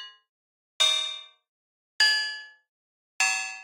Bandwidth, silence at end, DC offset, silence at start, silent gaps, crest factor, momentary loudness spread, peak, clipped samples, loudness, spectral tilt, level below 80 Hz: 16 kHz; 0 s; under 0.1%; 0 s; 0.29-0.80 s, 1.48-1.99 s, 2.69-3.19 s; 20 dB; 18 LU; -10 dBFS; under 0.1%; -23 LUFS; 5.5 dB/octave; under -90 dBFS